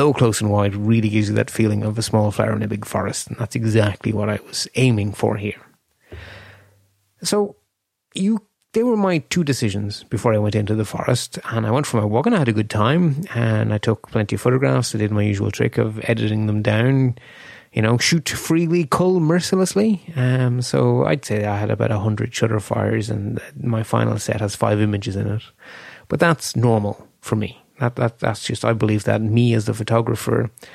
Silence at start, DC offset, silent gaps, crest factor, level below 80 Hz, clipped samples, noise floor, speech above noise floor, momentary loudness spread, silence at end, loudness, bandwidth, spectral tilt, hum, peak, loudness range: 0 s; under 0.1%; none; 18 dB; -52 dBFS; under 0.1%; -74 dBFS; 55 dB; 8 LU; 0.05 s; -20 LUFS; 14.5 kHz; -6 dB/octave; none; -2 dBFS; 4 LU